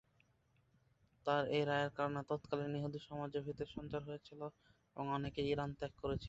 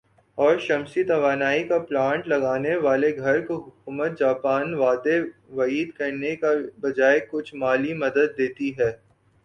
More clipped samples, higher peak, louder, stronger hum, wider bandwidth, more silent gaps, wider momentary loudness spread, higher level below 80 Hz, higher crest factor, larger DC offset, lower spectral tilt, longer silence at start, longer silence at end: neither; second, -22 dBFS vs -6 dBFS; second, -41 LUFS vs -23 LUFS; neither; second, 8 kHz vs 9 kHz; neither; first, 13 LU vs 7 LU; about the same, -64 dBFS vs -64 dBFS; first, 22 dB vs 16 dB; neither; about the same, -5 dB/octave vs -6 dB/octave; first, 1.25 s vs 0.35 s; second, 0 s vs 0.5 s